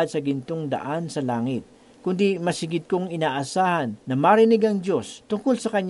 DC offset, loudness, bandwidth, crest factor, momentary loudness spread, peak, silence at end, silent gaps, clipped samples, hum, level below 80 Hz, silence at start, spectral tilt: under 0.1%; -23 LUFS; 11.5 kHz; 18 dB; 10 LU; -4 dBFS; 0 s; none; under 0.1%; none; -66 dBFS; 0 s; -6 dB/octave